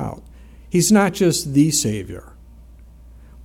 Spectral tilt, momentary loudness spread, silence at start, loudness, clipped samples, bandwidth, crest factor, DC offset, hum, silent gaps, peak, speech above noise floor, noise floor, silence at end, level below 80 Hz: -4.5 dB/octave; 20 LU; 0 s; -17 LUFS; under 0.1%; 16.5 kHz; 18 dB; under 0.1%; none; none; -2 dBFS; 26 dB; -43 dBFS; 0 s; -44 dBFS